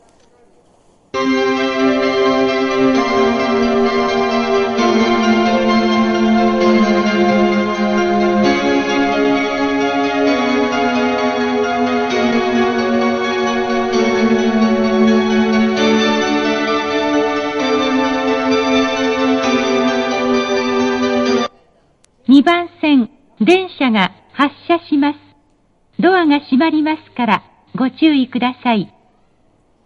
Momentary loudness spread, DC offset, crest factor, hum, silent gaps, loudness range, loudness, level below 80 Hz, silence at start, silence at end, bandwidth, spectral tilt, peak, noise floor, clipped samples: 4 LU; under 0.1%; 14 dB; none; none; 3 LU; -15 LUFS; -46 dBFS; 1.15 s; 1 s; 7.2 kHz; -5 dB/octave; 0 dBFS; -56 dBFS; under 0.1%